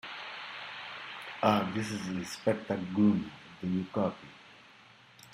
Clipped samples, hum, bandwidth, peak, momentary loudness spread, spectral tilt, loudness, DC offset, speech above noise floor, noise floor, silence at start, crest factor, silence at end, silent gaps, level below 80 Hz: under 0.1%; none; 16 kHz; -10 dBFS; 16 LU; -6 dB/octave; -33 LUFS; under 0.1%; 27 dB; -57 dBFS; 0.05 s; 22 dB; 0 s; none; -68 dBFS